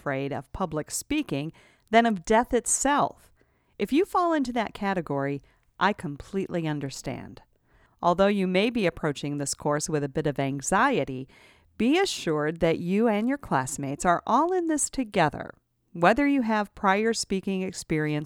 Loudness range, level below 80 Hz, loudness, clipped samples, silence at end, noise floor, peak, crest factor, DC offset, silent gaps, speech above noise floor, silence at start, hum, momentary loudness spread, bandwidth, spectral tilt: 3 LU; -52 dBFS; -26 LUFS; under 0.1%; 0 s; -62 dBFS; -4 dBFS; 22 dB; under 0.1%; none; 37 dB; 0.05 s; none; 10 LU; 17.5 kHz; -4.5 dB/octave